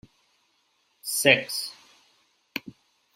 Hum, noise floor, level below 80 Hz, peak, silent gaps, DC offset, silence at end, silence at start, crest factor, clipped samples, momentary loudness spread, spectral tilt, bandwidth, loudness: none; -69 dBFS; -72 dBFS; -2 dBFS; none; under 0.1%; 0.45 s; 1.05 s; 28 dB; under 0.1%; 18 LU; -2 dB/octave; 16 kHz; -24 LUFS